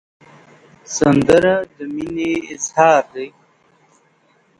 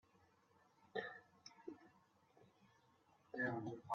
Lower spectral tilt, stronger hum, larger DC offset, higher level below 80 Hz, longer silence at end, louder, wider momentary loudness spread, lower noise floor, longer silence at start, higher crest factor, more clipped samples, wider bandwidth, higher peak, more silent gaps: about the same, -5 dB/octave vs -4.5 dB/octave; neither; neither; first, -50 dBFS vs -90 dBFS; first, 1.3 s vs 0 s; first, -16 LUFS vs -48 LUFS; about the same, 16 LU vs 17 LU; second, -57 dBFS vs -75 dBFS; about the same, 0.9 s vs 0.95 s; about the same, 18 dB vs 22 dB; neither; first, 11.5 kHz vs 7.2 kHz; first, 0 dBFS vs -30 dBFS; neither